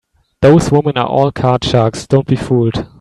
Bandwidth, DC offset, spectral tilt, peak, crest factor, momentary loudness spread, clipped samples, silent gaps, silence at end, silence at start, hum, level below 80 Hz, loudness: 12 kHz; under 0.1%; -7 dB/octave; 0 dBFS; 12 dB; 5 LU; under 0.1%; none; 0.15 s; 0.4 s; none; -36 dBFS; -13 LUFS